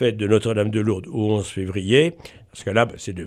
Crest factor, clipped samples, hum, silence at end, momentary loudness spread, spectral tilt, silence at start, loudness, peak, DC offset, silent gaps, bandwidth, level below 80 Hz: 18 dB; under 0.1%; none; 0 s; 9 LU; -6 dB/octave; 0 s; -21 LUFS; -4 dBFS; under 0.1%; none; 11.5 kHz; -52 dBFS